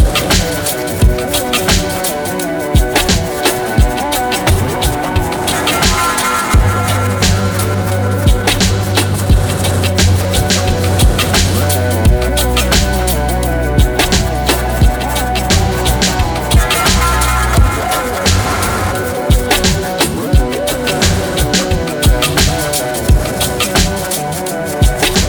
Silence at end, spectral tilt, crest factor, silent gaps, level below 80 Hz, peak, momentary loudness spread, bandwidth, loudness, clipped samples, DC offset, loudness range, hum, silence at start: 0 s; -4 dB/octave; 12 dB; none; -18 dBFS; 0 dBFS; 4 LU; over 20 kHz; -13 LUFS; under 0.1%; under 0.1%; 1 LU; none; 0 s